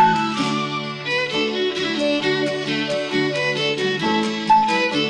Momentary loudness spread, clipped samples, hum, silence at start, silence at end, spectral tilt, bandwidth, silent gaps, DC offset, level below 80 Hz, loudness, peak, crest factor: 5 LU; under 0.1%; none; 0 s; 0 s; -4.5 dB/octave; 11 kHz; none; under 0.1%; -60 dBFS; -20 LUFS; -6 dBFS; 16 dB